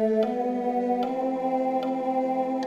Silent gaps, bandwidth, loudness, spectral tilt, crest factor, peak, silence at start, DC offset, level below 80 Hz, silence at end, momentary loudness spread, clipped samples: none; 7.6 kHz; -26 LUFS; -7 dB/octave; 12 dB; -12 dBFS; 0 s; under 0.1%; -72 dBFS; 0 s; 2 LU; under 0.1%